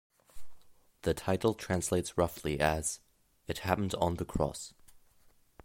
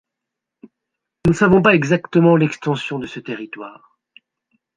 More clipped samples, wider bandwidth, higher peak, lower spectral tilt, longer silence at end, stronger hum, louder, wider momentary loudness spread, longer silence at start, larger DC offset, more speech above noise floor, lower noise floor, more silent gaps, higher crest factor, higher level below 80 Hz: neither; first, 16.5 kHz vs 9.4 kHz; second, -12 dBFS vs -2 dBFS; second, -5 dB/octave vs -7 dB/octave; second, 0.7 s vs 1.05 s; neither; second, -33 LUFS vs -16 LUFS; second, 11 LU vs 17 LU; second, 0.35 s vs 1.25 s; neither; second, 32 dB vs 66 dB; second, -64 dBFS vs -82 dBFS; neither; about the same, 22 dB vs 18 dB; about the same, -50 dBFS vs -46 dBFS